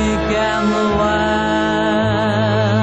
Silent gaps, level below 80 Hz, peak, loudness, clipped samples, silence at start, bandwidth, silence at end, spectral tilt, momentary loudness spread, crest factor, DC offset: none; -34 dBFS; -6 dBFS; -16 LUFS; under 0.1%; 0 s; 8.2 kHz; 0 s; -6 dB/octave; 1 LU; 10 dB; 0.3%